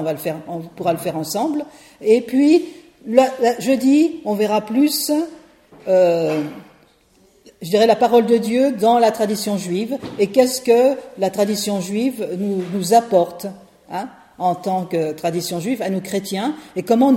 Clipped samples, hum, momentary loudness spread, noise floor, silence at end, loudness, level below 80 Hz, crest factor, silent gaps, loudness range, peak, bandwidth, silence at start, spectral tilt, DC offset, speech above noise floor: under 0.1%; none; 14 LU; -55 dBFS; 0 s; -18 LUFS; -62 dBFS; 18 dB; none; 4 LU; 0 dBFS; 16.5 kHz; 0 s; -5 dB/octave; under 0.1%; 37 dB